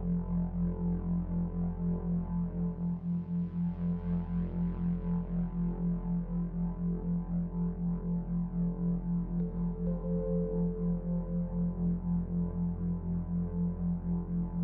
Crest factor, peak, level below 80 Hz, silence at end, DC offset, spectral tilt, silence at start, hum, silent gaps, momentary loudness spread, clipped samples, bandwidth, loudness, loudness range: 10 dB; -22 dBFS; -42 dBFS; 0 s; under 0.1%; -13.5 dB/octave; 0 s; none; none; 2 LU; under 0.1%; 2.1 kHz; -34 LUFS; 1 LU